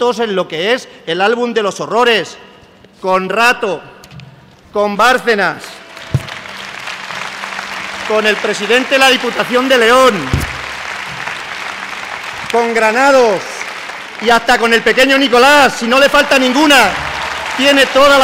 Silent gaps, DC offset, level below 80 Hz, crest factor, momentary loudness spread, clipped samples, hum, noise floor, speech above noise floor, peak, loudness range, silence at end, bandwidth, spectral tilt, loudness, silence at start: none; under 0.1%; -40 dBFS; 12 dB; 15 LU; under 0.1%; none; -42 dBFS; 31 dB; -2 dBFS; 7 LU; 0 s; 16.5 kHz; -3.5 dB/octave; -12 LUFS; 0 s